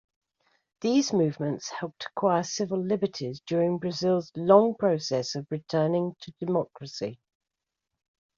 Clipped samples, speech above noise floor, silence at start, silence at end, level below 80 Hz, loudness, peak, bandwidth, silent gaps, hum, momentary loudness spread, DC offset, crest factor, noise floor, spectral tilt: under 0.1%; 61 dB; 0.8 s; 1.2 s; -70 dBFS; -27 LUFS; -6 dBFS; 7.6 kHz; none; none; 14 LU; under 0.1%; 22 dB; -87 dBFS; -5.5 dB/octave